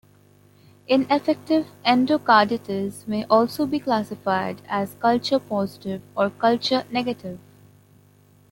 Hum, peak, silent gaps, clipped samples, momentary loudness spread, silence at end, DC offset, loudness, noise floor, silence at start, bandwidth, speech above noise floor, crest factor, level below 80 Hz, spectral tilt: 50 Hz at -45 dBFS; -2 dBFS; none; under 0.1%; 11 LU; 1.15 s; under 0.1%; -22 LUFS; -55 dBFS; 0.9 s; 17 kHz; 33 dB; 20 dB; -64 dBFS; -5.5 dB/octave